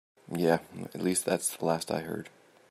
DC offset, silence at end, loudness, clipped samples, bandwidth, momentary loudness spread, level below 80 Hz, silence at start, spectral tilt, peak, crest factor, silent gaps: under 0.1%; 0.4 s; -31 LUFS; under 0.1%; 15.5 kHz; 12 LU; -72 dBFS; 0.3 s; -4.5 dB/octave; -10 dBFS; 22 dB; none